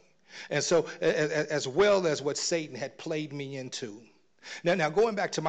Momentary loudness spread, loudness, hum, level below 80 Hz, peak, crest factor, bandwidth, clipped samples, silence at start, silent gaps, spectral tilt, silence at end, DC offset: 13 LU; -29 LUFS; none; -66 dBFS; -16 dBFS; 14 dB; 9.2 kHz; under 0.1%; 0.3 s; none; -4 dB/octave; 0 s; under 0.1%